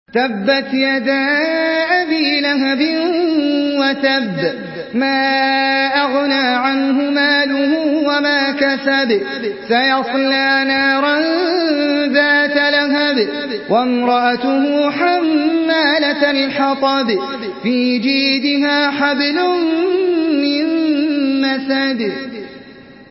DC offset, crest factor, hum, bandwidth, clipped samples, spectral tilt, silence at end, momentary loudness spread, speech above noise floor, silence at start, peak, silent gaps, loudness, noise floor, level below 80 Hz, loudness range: under 0.1%; 14 dB; none; 5.8 kHz; under 0.1%; -7.5 dB/octave; 0.05 s; 5 LU; 23 dB; 0.15 s; 0 dBFS; none; -15 LUFS; -38 dBFS; -60 dBFS; 2 LU